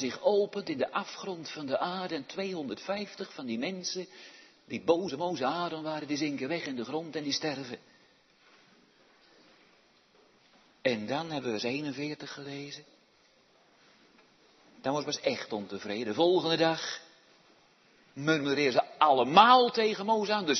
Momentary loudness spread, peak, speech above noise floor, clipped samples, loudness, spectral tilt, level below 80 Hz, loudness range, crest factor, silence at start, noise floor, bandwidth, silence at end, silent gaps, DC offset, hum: 15 LU; -6 dBFS; 35 dB; under 0.1%; -30 LUFS; -4 dB/octave; -78 dBFS; 13 LU; 24 dB; 0 s; -65 dBFS; 6.4 kHz; 0 s; none; under 0.1%; none